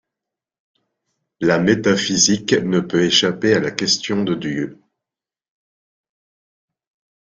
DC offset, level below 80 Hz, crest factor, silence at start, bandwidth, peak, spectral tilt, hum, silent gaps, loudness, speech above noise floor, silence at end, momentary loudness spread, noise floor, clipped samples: under 0.1%; -56 dBFS; 20 dB; 1.4 s; 10 kHz; 0 dBFS; -3.5 dB/octave; none; none; -17 LUFS; 71 dB; 2.6 s; 8 LU; -89 dBFS; under 0.1%